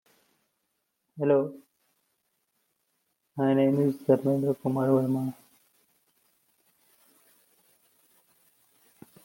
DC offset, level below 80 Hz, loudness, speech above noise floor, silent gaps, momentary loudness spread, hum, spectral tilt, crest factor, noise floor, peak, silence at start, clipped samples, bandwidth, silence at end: under 0.1%; -76 dBFS; -26 LUFS; 54 dB; none; 9 LU; none; -9 dB/octave; 22 dB; -79 dBFS; -8 dBFS; 1.15 s; under 0.1%; 17 kHz; 3.95 s